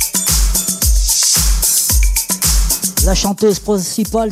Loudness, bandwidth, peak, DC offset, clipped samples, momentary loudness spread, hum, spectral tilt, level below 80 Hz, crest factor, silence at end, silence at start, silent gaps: -13 LUFS; 16.5 kHz; -2 dBFS; under 0.1%; under 0.1%; 6 LU; none; -3 dB/octave; -18 dBFS; 12 dB; 0 s; 0 s; none